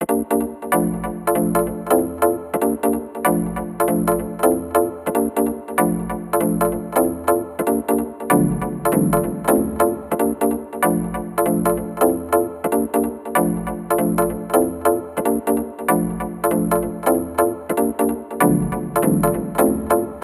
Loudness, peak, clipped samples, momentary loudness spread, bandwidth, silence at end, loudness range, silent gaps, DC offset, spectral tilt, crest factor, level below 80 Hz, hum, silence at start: -20 LUFS; -2 dBFS; under 0.1%; 4 LU; 16 kHz; 0 s; 1 LU; none; under 0.1%; -6 dB/octave; 18 dB; -42 dBFS; none; 0 s